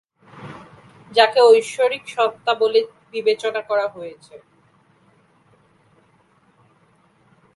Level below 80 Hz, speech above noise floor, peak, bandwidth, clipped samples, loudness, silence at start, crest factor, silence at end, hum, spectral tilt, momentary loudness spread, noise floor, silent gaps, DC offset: -70 dBFS; 40 dB; 0 dBFS; 11.5 kHz; under 0.1%; -18 LUFS; 0.35 s; 22 dB; 3.2 s; none; -2.5 dB/octave; 25 LU; -58 dBFS; none; under 0.1%